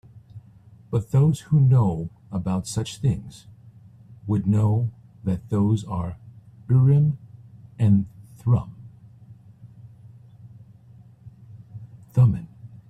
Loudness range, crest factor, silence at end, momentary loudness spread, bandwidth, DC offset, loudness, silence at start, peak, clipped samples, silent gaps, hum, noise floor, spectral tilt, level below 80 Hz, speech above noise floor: 5 LU; 16 dB; 0.1 s; 21 LU; 11 kHz; under 0.1%; -23 LUFS; 0.15 s; -8 dBFS; under 0.1%; none; none; -50 dBFS; -8.5 dB/octave; -50 dBFS; 29 dB